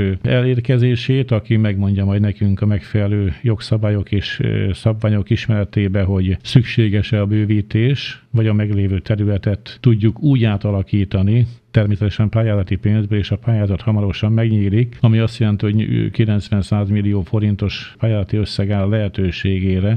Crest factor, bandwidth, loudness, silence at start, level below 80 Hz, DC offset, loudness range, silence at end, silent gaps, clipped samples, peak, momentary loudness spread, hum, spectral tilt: 16 dB; 8.6 kHz; -17 LUFS; 0 s; -38 dBFS; under 0.1%; 2 LU; 0 s; none; under 0.1%; 0 dBFS; 4 LU; none; -8.5 dB/octave